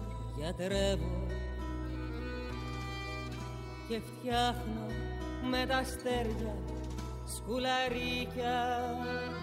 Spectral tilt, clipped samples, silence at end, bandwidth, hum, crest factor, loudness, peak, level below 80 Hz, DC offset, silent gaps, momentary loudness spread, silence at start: -5 dB/octave; under 0.1%; 0 s; 16 kHz; none; 18 dB; -36 LUFS; -18 dBFS; -42 dBFS; under 0.1%; none; 9 LU; 0 s